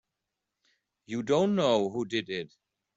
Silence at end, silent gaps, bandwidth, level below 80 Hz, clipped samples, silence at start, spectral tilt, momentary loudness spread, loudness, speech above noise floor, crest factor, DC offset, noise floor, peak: 0.5 s; none; 8 kHz; -70 dBFS; under 0.1%; 1.1 s; -5.5 dB/octave; 13 LU; -29 LUFS; 58 dB; 18 dB; under 0.1%; -86 dBFS; -12 dBFS